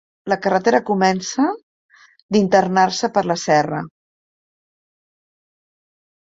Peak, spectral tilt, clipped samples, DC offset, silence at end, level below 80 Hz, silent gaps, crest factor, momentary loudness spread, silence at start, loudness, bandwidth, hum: -2 dBFS; -5 dB/octave; under 0.1%; under 0.1%; 2.35 s; -62 dBFS; 1.63-1.89 s, 2.22-2.29 s; 18 dB; 9 LU; 0.25 s; -18 LUFS; 7.8 kHz; none